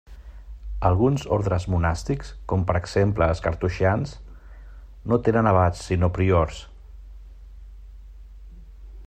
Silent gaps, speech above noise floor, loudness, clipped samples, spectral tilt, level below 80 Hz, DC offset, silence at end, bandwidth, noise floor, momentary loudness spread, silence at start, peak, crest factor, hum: none; 21 dB; -23 LUFS; under 0.1%; -7.5 dB/octave; -38 dBFS; under 0.1%; 0 s; 9.2 kHz; -42 dBFS; 15 LU; 0.1 s; -6 dBFS; 18 dB; none